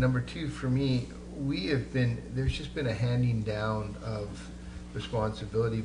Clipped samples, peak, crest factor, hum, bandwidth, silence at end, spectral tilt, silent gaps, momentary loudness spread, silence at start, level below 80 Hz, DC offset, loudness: under 0.1%; -16 dBFS; 16 dB; none; 10 kHz; 0 s; -7 dB/octave; none; 12 LU; 0 s; -44 dBFS; under 0.1%; -32 LUFS